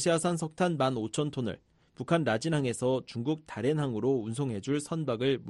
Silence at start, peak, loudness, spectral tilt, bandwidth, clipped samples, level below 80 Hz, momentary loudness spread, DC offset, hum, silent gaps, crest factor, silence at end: 0 s; -12 dBFS; -31 LUFS; -5.5 dB/octave; 11.5 kHz; under 0.1%; -64 dBFS; 6 LU; under 0.1%; none; none; 18 dB; 0 s